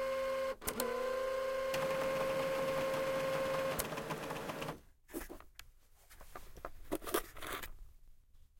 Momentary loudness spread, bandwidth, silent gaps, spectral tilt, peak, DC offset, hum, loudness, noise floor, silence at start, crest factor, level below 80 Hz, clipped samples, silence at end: 16 LU; 17 kHz; none; -3.5 dB/octave; -18 dBFS; under 0.1%; none; -38 LUFS; -61 dBFS; 0 s; 22 dB; -58 dBFS; under 0.1%; 0.15 s